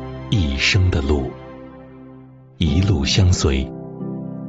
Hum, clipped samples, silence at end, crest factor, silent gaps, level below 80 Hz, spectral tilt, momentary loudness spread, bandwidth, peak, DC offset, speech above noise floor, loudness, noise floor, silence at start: none; under 0.1%; 0 s; 16 dB; none; -28 dBFS; -5 dB/octave; 21 LU; 8 kHz; -4 dBFS; under 0.1%; 25 dB; -19 LUFS; -42 dBFS; 0 s